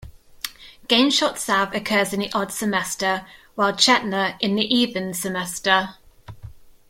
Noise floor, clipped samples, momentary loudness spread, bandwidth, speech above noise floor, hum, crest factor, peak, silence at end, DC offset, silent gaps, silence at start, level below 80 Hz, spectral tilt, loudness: -42 dBFS; under 0.1%; 17 LU; 16.5 kHz; 21 dB; none; 22 dB; -2 dBFS; 0.2 s; under 0.1%; none; 0 s; -54 dBFS; -3 dB/octave; -20 LUFS